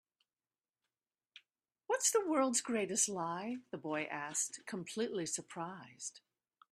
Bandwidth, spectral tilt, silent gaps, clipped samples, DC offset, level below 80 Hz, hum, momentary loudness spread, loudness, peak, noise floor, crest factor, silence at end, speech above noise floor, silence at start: 15 kHz; -2.5 dB/octave; none; under 0.1%; under 0.1%; -86 dBFS; none; 14 LU; -37 LUFS; -20 dBFS; under -90 dBFS; 20 dB; 0.55 s; over 52 dB; 1.9 s